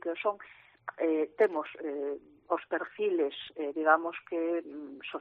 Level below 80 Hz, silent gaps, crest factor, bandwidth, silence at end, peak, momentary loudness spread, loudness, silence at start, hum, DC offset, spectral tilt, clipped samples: -82 dBFS; none; 22 dB; 4.5 kHz; 0 s; -10 dBFS; 17 LU; -32 LUFS; 0.05 s; none; under 0.1%; -1.5 dB/octave; under 0.1%